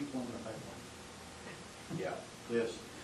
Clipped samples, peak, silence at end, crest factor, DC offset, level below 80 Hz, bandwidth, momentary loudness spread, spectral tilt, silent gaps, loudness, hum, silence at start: under 0.1%; -22 dBFS; 0 s; 20 dB; under 0.1%; -66 dBFS; 13 kHz; 12 LU; -4.5 dB/octave; none; -42 LUFS; none; 0 s